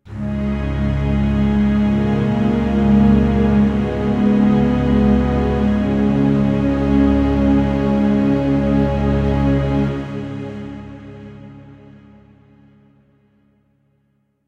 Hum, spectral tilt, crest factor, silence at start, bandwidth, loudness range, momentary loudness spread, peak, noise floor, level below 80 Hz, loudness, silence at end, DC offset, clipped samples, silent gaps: none; -9 dB/octave; 14 dB; 0.05 s; 6.8 kHz; 9 LU; 12 LU; -2 dBFS; -64 dBFS; -26 dBFS; -16 LUFS; 2.75 s; under 0.1%; under 0.1%; none